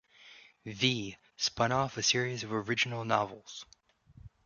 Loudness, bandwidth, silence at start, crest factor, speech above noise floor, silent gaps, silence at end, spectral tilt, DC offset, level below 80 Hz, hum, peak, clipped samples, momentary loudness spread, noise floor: -31 LUFS; 7.4 kHz; 0.2 s; 24 dB; 26 dB; none; 0.2 s; -3 dB/octave; under 0.1%; -64 dBFS; none; -10 dBFS; under 0.1%; 18 LU; -58 dBFS